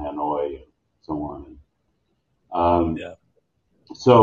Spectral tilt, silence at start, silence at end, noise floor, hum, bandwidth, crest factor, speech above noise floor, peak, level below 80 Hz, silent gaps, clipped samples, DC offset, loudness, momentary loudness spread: -7.5 dB/octave; 0 s; 0 s; -71 dBFS; none; 7.2 kHz; 22 dB; 47 dB; 0 dBFS; -50 dBFS; none; under 0.1%; under 0.1%; -23 LUFS; 20 LU